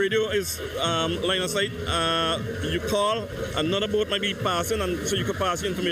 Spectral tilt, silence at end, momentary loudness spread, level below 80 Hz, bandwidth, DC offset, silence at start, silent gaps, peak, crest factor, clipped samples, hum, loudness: -3.5 dB/octave; 0 s; 4 LU; -44 dBFS; 15.5 kHz; under 0.1%; 0 s; none; -12 dBFS; 14 dB; under 0.1%; none; -25 LUFS